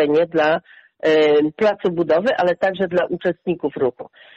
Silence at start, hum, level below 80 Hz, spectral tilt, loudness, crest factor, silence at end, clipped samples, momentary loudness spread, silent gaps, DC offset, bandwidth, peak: 0 s; none; -60 dBFS; -6.5 dB/octave; -19 LUFS; 10 dB; 0.3 s; under 0.1%; 7 LU; none; under 0.1%; 7.8 kHz; -8 dBFS